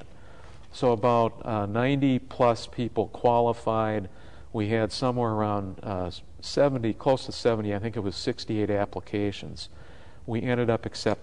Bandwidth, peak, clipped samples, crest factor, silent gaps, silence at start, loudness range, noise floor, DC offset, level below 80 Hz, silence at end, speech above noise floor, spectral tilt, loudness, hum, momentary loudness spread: 10.5 kHz; -10 dBFS; under 0.1%; 18 dB; none; 0.05 s; 4 LU; -49 dBFS; 0.7%; -52 dBFS; 0 s; 23 dB; -6.5 dB/octave; -27 LUFS; none; 10 LU